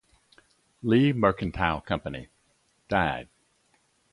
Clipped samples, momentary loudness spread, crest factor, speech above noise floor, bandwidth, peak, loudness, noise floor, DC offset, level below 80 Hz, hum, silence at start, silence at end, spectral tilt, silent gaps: under 0.1%; 14 LU; 22 dB; 43 dB; 11 kHz; -6 dBFS; -26 LUFS; -68 dBFS; under 0.1%; -48 dBFS; none; 0.85 s; 0.9 s; -8 dB/octave; none